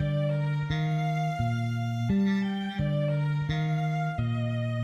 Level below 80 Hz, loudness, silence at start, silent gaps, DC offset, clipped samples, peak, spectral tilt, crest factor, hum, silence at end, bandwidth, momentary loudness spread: -50 dBFS; -28 LUFS; 0 s; none; under 0.1%; under 0.1%; -16 dBFS; -8 dB/octave; 12 dB; none; 0 s; 7.4 kHz; 3 LU